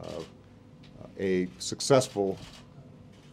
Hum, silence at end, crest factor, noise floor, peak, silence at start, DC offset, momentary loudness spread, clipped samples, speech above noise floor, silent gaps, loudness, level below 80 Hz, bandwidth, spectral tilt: none; 0.05 s; 22 dB; -52 dBFS; -8 dBFS; 0 s; under 0.1%; 25 LU; under 0.1%; 25 dB; none; -29 LUFS; -62 dBFS; 15 kHz; -4.5 dB/octave